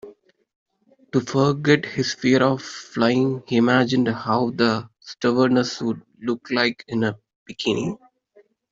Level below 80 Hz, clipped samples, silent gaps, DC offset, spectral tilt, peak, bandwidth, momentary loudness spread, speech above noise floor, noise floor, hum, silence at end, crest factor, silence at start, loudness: -60 dBFS; under 0.1%; 0.56-0.66 s, 7.36-7.46 s; under 0.1%; -5.5 dB/octave; -4 dBFS; 7.8 kHz; 10 LU; 37 dB; -57 dBFS; none; 0.75 s; 18 dB; 0.05 s; -21 LUFS